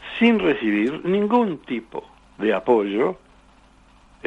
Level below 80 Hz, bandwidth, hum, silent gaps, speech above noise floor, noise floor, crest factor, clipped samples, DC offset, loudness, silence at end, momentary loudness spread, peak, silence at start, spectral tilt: -56 dBFS; 8 kHz; none; none; 32 dB; -53 dBFS; 16 dB; under 0.1%; under 0.1%; -21 LUFS; 0 s; 12 LU; -6 dBFS; 0 s; -7.5 dB/octave